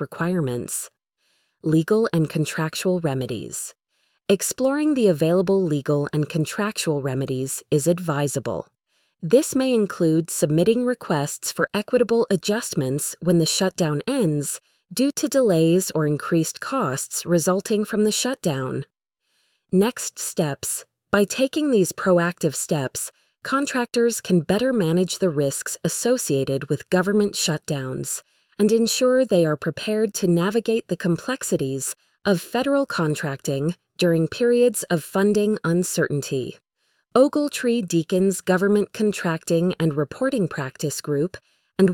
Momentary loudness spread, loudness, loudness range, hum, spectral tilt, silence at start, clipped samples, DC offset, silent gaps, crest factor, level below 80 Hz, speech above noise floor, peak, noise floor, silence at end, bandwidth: 9 LU; -22 LUFS; 3 LU; none; -5 dB/octave; 0 s; under 0.1%; under 0.1%; none; 18 dB; -60 dBFS; 50 dB; -4 dBFS; -72 dBFS; 0 s; 19 kHz